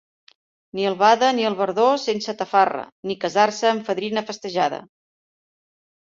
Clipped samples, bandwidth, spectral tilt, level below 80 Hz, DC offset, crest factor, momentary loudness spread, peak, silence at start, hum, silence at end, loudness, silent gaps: under 0.1%; 7.8 kHz; -4 dB/octave; -70 dBFS; under 0.1%; 20 dB; 10 LU; -2 dBFS; 0.75 s; none; 1.35 s; -21 LUFS; 2.92-3.03 s